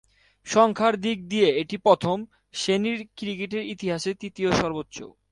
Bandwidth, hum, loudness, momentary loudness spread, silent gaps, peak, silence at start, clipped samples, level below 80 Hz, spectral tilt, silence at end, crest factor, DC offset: 11.5 kHz; none; -24 LUFS; 13 LU; none; -4 dBFS; 0.45 s; under 0.1%; -56 dBFS; -4.5 dB/octave; 0.2 s; 20 dB; under 0.1%